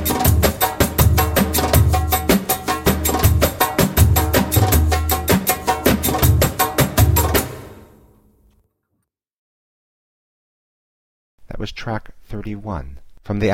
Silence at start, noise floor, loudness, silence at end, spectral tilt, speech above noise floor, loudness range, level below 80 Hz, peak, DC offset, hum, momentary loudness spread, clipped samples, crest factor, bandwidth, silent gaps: 0 s; -73 dBFS; -17 LUFS; 0 s; -4.5 dB/octave; 49 dB; 17 LU; -26 dBFS; 0 dBFS; under 0.1%; none; 14 LU; under 0.1%; 18 dB; 17 kHz; 9.33-11.38 s